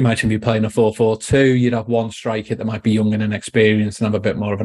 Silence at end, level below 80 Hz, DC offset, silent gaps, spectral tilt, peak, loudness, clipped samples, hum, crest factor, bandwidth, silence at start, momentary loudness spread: 0 s; -46 dBFS; under 0.1%; none; -6.5 dB/octave; 0 dBFS; -18 LUFS; under 0.1%; none; 16 dB; 12 kHz; 0 s; 7 LU